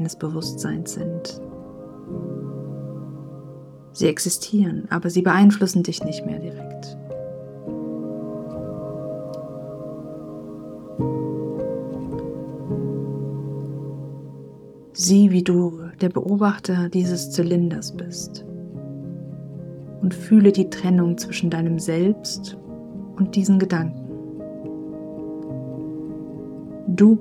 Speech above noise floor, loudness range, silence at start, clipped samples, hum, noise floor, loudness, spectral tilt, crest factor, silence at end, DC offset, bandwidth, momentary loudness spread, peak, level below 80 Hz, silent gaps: 23 dB; 11 LU; 0 s; under 0.1%; none; -43 dBFS; -22 LUFS; -6 dB/octave; 20 dB; 0 s; under 0.1%; 14.5 kHz; 19 LU; -2 dBFS; -56 dBFS; none